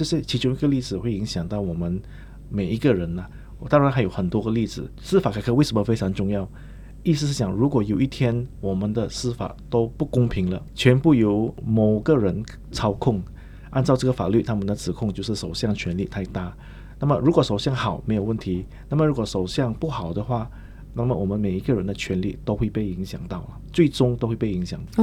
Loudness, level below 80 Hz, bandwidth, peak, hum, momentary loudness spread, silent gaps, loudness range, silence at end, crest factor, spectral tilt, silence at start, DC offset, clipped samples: -23 LUFS; -40 dBFS; 14 kHz; -2 dBFS; none; 12 LU; none; 4 LU; 0 s; 20 dB; -7 dB/octave; 0 s; under 0.1%; under 0.1%